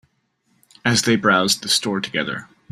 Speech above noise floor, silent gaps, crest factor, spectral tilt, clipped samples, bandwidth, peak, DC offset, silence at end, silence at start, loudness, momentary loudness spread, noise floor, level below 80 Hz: 47 dB; none; 20 dB; -3 dB/octave; under 0.1%; 15.5 kHz; -2 dBFS; under 0.1%; 0.25 s; 0.85 s; -18 LUFS; 9 LU; -67 dBFS; -58 dBFS